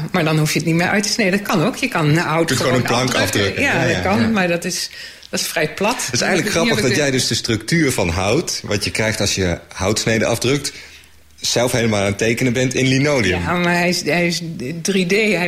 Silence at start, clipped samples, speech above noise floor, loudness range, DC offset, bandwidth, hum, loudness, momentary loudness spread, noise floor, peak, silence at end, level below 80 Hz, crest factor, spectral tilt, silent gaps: 0 s; under 0.1%; 27 dB; 2 LU; under 0.1%; 16 kHz; none; -17 LUFS; 5 LU; -44 dBFS; -4 dBFS; 0 s; -44 dBFS; 14 dB; -4 dB/octave; none